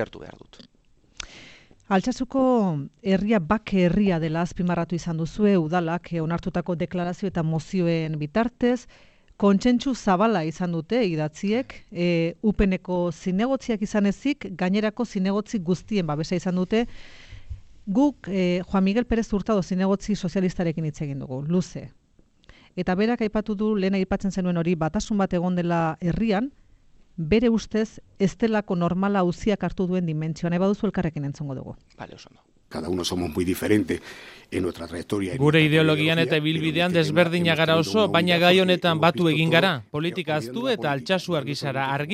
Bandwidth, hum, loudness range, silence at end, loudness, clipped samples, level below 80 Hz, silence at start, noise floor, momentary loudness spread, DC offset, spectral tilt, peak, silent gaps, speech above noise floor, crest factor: 14 kHz; none; 7 LU; 0 s; -24 LUFS; under 0.1%; -46 dBFS; 0 s; -59 dBFS; 11 LU; under 0.1%; -6.5 dB/octave; -2 dBFS; none; 36 dB; 22 dB